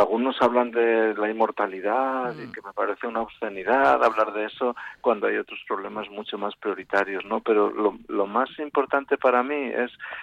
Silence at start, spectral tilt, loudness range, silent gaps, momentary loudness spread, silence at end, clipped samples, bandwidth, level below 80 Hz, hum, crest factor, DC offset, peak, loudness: 0 s; -6 dB/octave; 2 LU; none; 10 LU; 0 s; under 0.1%; 7.8 kHz; -64 dBFS; none; 16 dB; under 0.1%; -8 dBFS; -24 LUFS